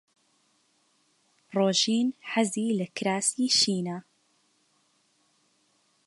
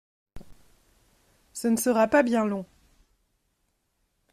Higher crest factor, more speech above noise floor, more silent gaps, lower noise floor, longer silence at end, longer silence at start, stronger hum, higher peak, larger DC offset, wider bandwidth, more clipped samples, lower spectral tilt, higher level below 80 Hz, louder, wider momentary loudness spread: about the same, 20 dB vs 20 dB; second, 43 dB vs 51 dB; neither; second, -69 dBFS vs -74 dBFS; first, 2.05 s vs 1.7 s; first, 1.5 s vs 0.35 s; neither; about the same, -10 dBFS vs -10 dBFS; neither; second, 11.5 kHz vs 15.5 kHz; neither; second, -3 dB/octave vs -4.5 dB/octave; second, -78 dBFS vs -60 dBFS; about the same, -26 LUFS vs -24 LUFS; second, 10 LU vs 18 LU